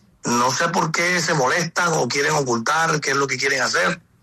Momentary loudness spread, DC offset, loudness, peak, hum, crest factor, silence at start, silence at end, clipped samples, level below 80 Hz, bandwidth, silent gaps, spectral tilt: 2 LU; under 0.1%; -19 LUFS; -8 dBFS; none; 12 dB; 0.25 s; 0.25 s; under 0.1%; -62 dBFS; 14 kHz; none; -3 dB/octave